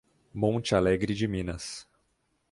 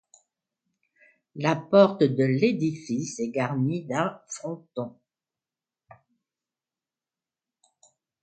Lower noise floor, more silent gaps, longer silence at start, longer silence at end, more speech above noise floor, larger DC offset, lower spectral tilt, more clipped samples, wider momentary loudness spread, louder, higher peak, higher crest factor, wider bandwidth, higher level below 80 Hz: second, -74 dBFS vs under -90 dBFS; neither; second, 0.35 s vs 1.35 s; second, 0.7 s vs 3.35 s; second, 46 dB vs over 65 dB; neither; about the same, -6 dB/octave vs -6.5 dB/octave; neither; about the same, 15 LU vs 16 LU; second, -28 LUFS vs -25 LUFS; second, -10 dBFS vs -4 dBFS; about the same, 20 dB vs 24 dB; first, 11.5 kHz vs 9.2 kHz; first, -50 dBFS vs -72 dBFS